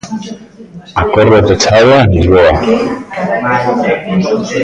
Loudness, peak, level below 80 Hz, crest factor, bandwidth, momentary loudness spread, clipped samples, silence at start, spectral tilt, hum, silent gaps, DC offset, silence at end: -10 LUFS; 0 dBFS; -26 dBFS; 10 dB; 9.8 kHz; 12 LU; under 0.1%; 0.05 s; -5.5 dB/octave; none; none; under 0.1%; 0 s